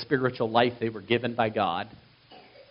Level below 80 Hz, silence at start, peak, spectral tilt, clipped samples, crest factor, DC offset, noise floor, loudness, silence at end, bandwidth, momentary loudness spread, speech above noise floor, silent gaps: -64 dBFS; 0 s; -6 dBFS; -3.5 dB/octave; under 0.1%; 22 dB; under 0.1%; -53 dBFS; -27 LUFS; 0.1 s; 5.6 kHz; 9 LU; 26 dB; none